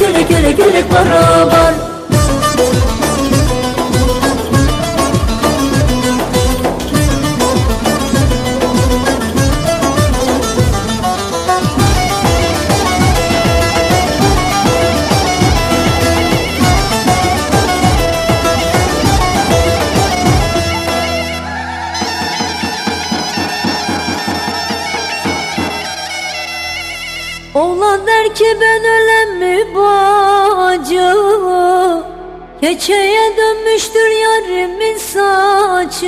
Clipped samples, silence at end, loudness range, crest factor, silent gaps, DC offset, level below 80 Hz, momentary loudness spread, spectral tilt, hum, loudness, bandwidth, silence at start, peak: under 0.1%; 0 s; 6 LU; 12 dB; none; under 0.1%; -24 dBFS; 7 LU; -4.5 dB/octave; none; -12 LUFS; 15.5 kHz; 0 s; 0 dBFS